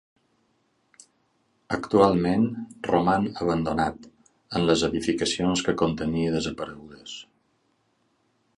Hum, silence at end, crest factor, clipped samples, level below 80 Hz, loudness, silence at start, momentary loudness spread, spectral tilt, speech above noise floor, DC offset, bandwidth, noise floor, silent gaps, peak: none; 1.35 s; 22 dB; under 0.1%; -50 dBFS; -25 LUFS; 1.7 s; 18 LU; -5.5 dB/octave; 45 dB; under 0.1%; 11.5 kHz; -69 dBFS; none; -4 dBFS